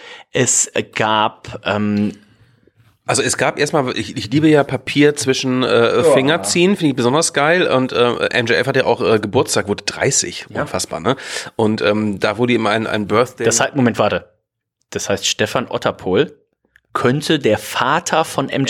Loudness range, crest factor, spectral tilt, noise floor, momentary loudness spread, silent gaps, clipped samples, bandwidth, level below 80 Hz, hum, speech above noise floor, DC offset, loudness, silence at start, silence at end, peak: 5 LU; 16 dB; -4 dB/octave; -72 dBFS; 8 LU; none; under 0.1%; 17 kHz; -56 dBFS; none; 56 dB; under 0.1%; -16 LUFS; 0 s; 0 s; -2 dBFS